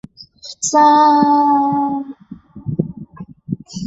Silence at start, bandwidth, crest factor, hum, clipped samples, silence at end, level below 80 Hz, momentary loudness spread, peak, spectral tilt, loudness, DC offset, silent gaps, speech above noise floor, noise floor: 0.2 s; 8 kHz; 14 dB; none; under 0.1%; 0 s; -52 dBFS; 24 LU; -2 dBFS; -5 dB/octave; -14 LUFS; under 0.1%; none; 22 dB; -35 dBFS